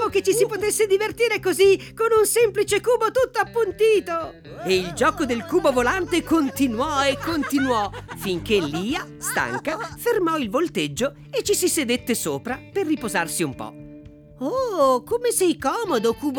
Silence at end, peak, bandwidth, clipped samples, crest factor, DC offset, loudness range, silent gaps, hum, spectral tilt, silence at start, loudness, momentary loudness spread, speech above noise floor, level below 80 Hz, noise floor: 0 s; -8 dBFS; 20 kHz; under 0.1%; 14 dB; under 0.1%; 5 LU; none; none; -3.5 dB/octave; 0 s; -22 LUFS; 9 LU; 22 dB; -50 dBFS; -43 dBFS